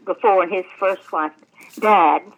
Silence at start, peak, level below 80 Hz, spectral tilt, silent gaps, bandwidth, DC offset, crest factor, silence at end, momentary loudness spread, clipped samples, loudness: 0.05 s; -2 dBFS; -86 dBFS; -5 dB/octave; none; 19 kHz; under 0.1%; 16 dB; 0.15 s; 10 LU; under 0.1%; -18 LUFS